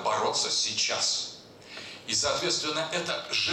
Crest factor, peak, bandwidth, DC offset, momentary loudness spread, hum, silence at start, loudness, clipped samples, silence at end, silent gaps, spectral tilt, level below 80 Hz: 14 dB; -16 dBFS; 16 kHz; under 0.1%; 16 LU; none; 0 s; -27 LUFS; under 0.1%; 0 s; none; -1 dB/octave; -64 dBFS